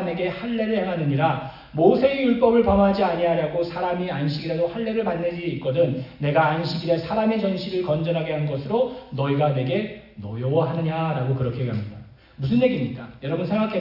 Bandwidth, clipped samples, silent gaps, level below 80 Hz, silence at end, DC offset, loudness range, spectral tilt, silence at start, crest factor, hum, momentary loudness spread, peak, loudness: 5.8 kHz; under 0.1%; none; -48 dBFS; 0 s; under 0.1%; 4 LU; -9 dB/octave; 0 s; 18 dB; none; 9 LU; -4 dBFS; -23 LUFS